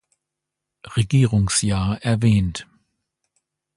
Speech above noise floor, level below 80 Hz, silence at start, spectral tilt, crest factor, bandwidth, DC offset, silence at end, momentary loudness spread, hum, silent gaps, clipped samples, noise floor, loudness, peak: 64 dB; -40 dBFS; 0.85 s; -5.5 dB/octave; 16 dB; 11.5 kHz; under 0.1%; 1.15 s; 10 LU; none; none; under 0.1%; -83 dBFS; -20 LUFS; -6 dBFS